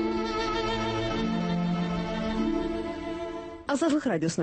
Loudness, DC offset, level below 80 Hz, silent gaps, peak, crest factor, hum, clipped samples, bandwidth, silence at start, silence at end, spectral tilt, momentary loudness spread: -29 LUFS; under 0.1%; -44 dBFS; none; -16 dBFS; 14 dB; none; under 0.1%; 8.8 kHz; 0 s; 0 s; -5.5 dB/octave; 8 LU